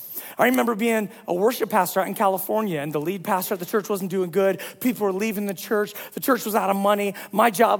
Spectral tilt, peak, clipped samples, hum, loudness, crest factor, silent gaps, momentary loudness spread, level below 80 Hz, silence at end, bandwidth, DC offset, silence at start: -4.5 dB/octave; -4 dBFS; under 0.1%; none; -23 LUFS; 20 dB; none; 5 LU; -74 dBFS; 0 s; 18 kHz; under 0.1%; 0 s